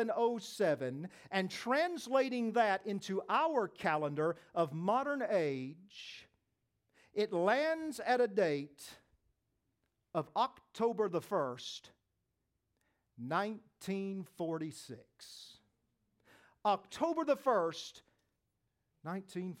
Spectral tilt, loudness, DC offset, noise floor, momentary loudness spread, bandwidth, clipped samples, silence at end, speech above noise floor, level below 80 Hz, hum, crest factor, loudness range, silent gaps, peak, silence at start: -5.5 dB/octave; -36 LUFS; under 0.1%; -84 dBFS; 17 LU; 16.5 kHz; under 0.1%; 0.05 s; 49 dB; -84 dBFS; none; 20 dB; 8 LU; none; -18 dBFS; 0 s